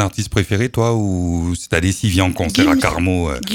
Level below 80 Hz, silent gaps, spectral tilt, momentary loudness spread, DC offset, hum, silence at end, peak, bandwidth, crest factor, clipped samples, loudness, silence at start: -32 dBFS; none; -5.5 dB/octave; 6 LU; under 0.1%; none; 0 s; 0 dBFS; 17.5 kHz; 16 dB; under 0.1%; -17 LUFS; 0 s